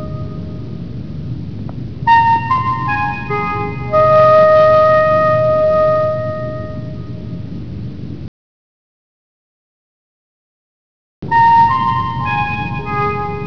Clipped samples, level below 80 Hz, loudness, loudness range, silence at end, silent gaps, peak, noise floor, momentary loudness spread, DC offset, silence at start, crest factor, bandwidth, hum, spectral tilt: under 0.1%; -38 dBFS; -13 LUFS; 18 LU; 0 s; 8.28-11.22 s; -2 dBFS; under -90 dBFS; 18 LU; 2%; 0 s; 12 dB; 5.4 kHz; none; -8 dB/octave